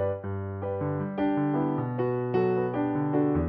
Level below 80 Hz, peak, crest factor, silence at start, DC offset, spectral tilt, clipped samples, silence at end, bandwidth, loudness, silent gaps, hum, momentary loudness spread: -50 dBFS; -12 dBFS; 14 dB; 0 s; under 0.1%; -8.5 dB/octave; under 0.1%; 0 s; 4.9 kHz; -28 LUFS; none; none; 7 LU